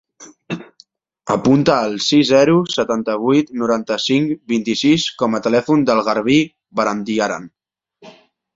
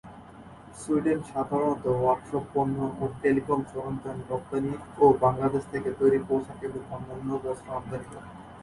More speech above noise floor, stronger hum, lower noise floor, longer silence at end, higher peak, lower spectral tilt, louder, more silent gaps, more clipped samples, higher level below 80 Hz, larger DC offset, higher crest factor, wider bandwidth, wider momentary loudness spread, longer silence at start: first, 36 dB vs 20 dB; neither; first, -52 dBFS vs -47 dBFS; first, 0.45 s vs 0 s; first, -2 dBFS vs -8 dBFS; second, -5 dB/octave vs -8 dB/octave; first, -16 LUFS vs -28 LUFS; neither; neither; about the same, -56 dBFS vs -54 dBFS; neither; about the same, 16 dB vs 20 dB; second, 7.8 kHz vs 11.5 kHz; second, 9 LU vs 17 LU; first, 0.2 s vs 0.05 s